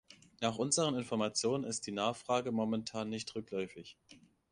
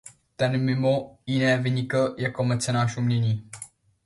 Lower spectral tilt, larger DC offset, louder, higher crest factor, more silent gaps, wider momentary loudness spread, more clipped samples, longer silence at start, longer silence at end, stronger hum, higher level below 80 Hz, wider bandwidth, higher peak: second, -4 dB/octave vs -6 dB/octave; neither; second, -36 LUFS vs -25 LUFS; about the same, 20 dB vs 16 dB; neither; about the same, 9 LU vs 8 LU; neither; about the same, 0.1 s vs 0.05 s; about the same, 0.35 s vs 0.4 s; neither; second, -72 dBFS vs -60 dBFS; about the same, 11 kHz vs 11.5 kHz; second, -18 dBFS vs -8 dBFS